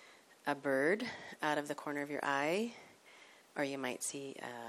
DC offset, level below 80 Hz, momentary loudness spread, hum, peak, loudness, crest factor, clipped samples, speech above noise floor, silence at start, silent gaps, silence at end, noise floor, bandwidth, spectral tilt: under 0.1%; -86 dBFS; 12 LU; none; -20 dBFS; -38 LUFS; 18 dB; under 0.1%; 23 dB; 0 s; none; 0 s; -61 dBFS; 15.5 kHz; -3.5 dB/octave